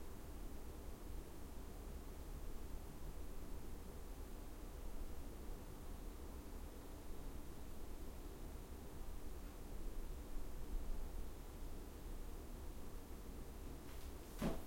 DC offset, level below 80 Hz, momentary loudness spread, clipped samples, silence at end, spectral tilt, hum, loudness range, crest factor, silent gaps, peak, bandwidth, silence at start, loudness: under 0.1%; -50 dBFS; 3 LU; under 0.1%; 0 s; -5.5 dB/octave; none; 1 LU; 18 dB; none; -30 dBFS; 16 kHz; 0 s; -54 LUFS